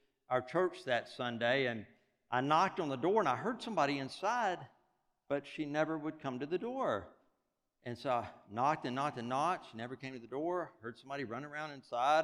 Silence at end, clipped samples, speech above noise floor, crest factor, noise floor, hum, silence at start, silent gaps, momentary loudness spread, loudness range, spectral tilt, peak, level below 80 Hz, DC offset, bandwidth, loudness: 0 s; under 0.1%; 48 dB; 20 dB; -84 dBFS; none; 0.3 s; none; 12 LU; 5 LU; -5.5 dB/octave; -16 dBFS; -80 dBFS; under 0.1%; 12 kHz; -36 LUFS